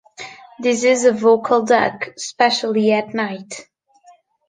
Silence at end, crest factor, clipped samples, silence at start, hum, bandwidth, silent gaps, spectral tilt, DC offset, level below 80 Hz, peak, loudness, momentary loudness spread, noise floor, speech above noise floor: 0.85 s; 16 dB; under 0.1%; 0.2 s; none; 9.8 kHz; none; -3.5 dB/octave; under 0.1%; -64 dBFS; -2 dBFS; -17 LUFS; 20 LU; -51 dBFS; 35 dB